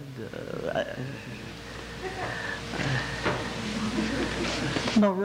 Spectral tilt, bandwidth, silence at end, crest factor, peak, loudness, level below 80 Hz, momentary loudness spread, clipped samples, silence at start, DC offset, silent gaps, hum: -5 dB/octave; 16 kHz; 0 s; 20 dB; -10 dBFS; -30 LUFS; -48 dBFS; 12 LU; under 0.1%; 0 s; under 0.1%; none; none